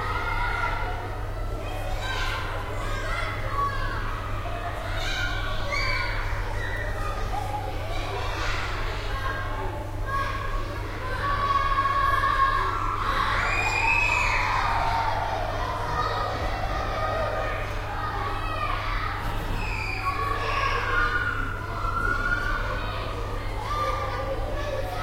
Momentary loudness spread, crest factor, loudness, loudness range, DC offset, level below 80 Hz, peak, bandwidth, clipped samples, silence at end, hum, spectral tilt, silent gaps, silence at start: 9 LU; 16 dB; -27 LUFS; 7 LU; under 0.1%; -32 dBFS; -10 dBFS; 16 kHz; under 0.1%; 0 s; none; -4.5 dB/octave; none; 0 s